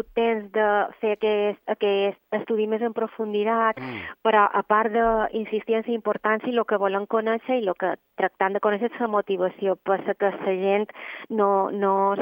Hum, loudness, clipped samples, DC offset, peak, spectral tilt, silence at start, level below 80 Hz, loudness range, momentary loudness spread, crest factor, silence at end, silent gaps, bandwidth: none; -24 LUFS; under 0.1%; under 0.1%; -4 dBFS; -8.5 dB/octave; 0.15 s; -58 dBFS; 2 LU; 6 LU; 18 dB; 0 s; none; 16.5 kHz